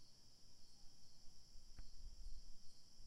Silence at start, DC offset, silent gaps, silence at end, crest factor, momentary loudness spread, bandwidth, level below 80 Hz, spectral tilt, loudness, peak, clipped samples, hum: 0 s; under 0.1%; none; 0 s; 12 dB; 6 LU; 12 kHz; -58 dBFS; -3 dB/octave; -65 LUFS; -38 dBFS; under 0.1%; none